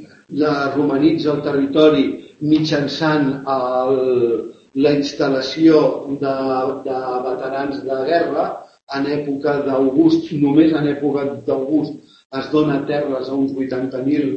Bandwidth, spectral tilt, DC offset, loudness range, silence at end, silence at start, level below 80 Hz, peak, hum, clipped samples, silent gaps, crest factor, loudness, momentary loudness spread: 7.2 kHz; -7 dB/octave; under 0.1%; 4 LU; 0 s; 0 s; -56 dBFS; 0 dBFS; none; under 0.1%; 8.83-8.87 s, 12.25-12.30 s; 18 dB; -18 LUFS; 9 LU